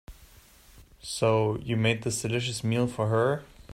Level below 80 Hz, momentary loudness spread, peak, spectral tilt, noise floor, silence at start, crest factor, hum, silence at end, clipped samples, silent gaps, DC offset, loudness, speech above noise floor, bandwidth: -54 dBFS; 7 LU; -10 dBFS; -5 dB/octave; -55 dBFS; 0.1 s; 18 dB; none; 0 s; under 0.1%; none; under 0.1%; -27 LUFS; 28 dB; 15.5 kHz